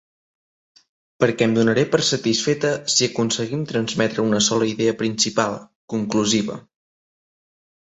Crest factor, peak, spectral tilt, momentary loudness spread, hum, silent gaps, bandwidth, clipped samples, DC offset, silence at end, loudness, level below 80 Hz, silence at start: 20 dB; -2 dBFS; -3.5 dB/octave; 7 LU; none; 5.75-5.88 s; 8.2 kHz; under 0.1%; under 0.1%; 1.35 s; -20 LUFS; -60 dBFS; 1.2 s